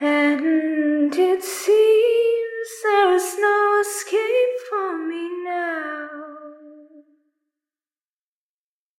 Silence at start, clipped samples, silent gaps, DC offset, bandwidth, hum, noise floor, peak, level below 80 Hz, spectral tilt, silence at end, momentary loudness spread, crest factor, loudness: 0 s; under 0.1%; none; under 0.1%; 16.5 kHz; none; under -90 dBFS; -6 dBFS; -80 dBFS; -1.5 dB/octave; 2.2 s; 12 LU; 14 dB; -20 LUFS